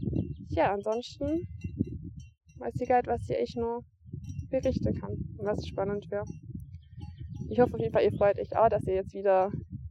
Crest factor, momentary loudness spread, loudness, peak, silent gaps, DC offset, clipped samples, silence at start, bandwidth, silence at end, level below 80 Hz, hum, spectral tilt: 20 dB; 18 LU; -30 LUFS; -12 dBFS; none; under 0.1%; under 0.1%; 0 s; 10.5 kHz; 0 s; -48 dBFS; none; -8 dB/octave